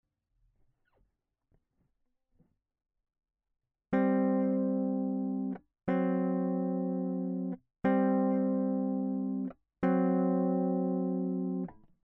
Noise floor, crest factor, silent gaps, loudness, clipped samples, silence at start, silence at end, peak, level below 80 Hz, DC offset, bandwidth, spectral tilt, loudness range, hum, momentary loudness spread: -78 dBFS; 16 dB; none; -31 LUFS; under 0.1%; 3.9 s; 0.3 s; -16 dBFS; -70 dBFS; under 0.1%; 3.4 kHz; -10 dB/octave; 4 LU; none; 8 LU